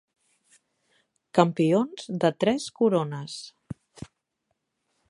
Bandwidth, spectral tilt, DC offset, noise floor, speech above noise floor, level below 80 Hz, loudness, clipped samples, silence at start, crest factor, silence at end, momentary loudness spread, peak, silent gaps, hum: 11.5 kHz; -6.5 dB/octave; under 0.1%; -79 dBFS; 54 dB; -64 dBFS; -25 LUFS; under 0.1%; 1.35 s; 26 dB; 1.05 s; 21 LU; -2 dBFS; none; none